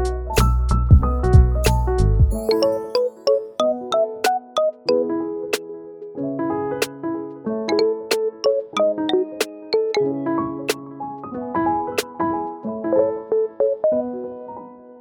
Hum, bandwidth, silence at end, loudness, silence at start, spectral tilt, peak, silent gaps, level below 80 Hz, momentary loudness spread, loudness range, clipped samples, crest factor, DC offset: none; 19 kHz; 0 s; -21 LUFS; 0 s; -6 dB/octave; 0 dBFS; none; -26 dBFS; 12 LU; 6 LU; under 0.1%; 20 dB; under 0.1%